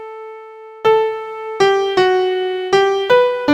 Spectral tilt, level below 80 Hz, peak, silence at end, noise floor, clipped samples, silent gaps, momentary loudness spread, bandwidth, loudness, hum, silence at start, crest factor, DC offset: -4 dB/octave; -58 dBFS; 0 dBFS; 0 s; -36 dBFS; under 0.1%; none; 19 LU; 9.4 kHz; -15 LUFS; none; 0 s; 14 dB; under 0.1%